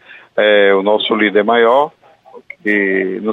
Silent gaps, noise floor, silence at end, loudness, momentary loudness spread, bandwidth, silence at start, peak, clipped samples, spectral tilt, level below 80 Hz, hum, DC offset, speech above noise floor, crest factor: none; -41 dBFS; 0 s; -13 LUFS; 9 LU; 4.1 kHz; 0.1 s; -2 dBFS; under 0.1%; -6.5 dB/octave; -64 dBFS; none; under 0.1%; 29 dB; 12 dB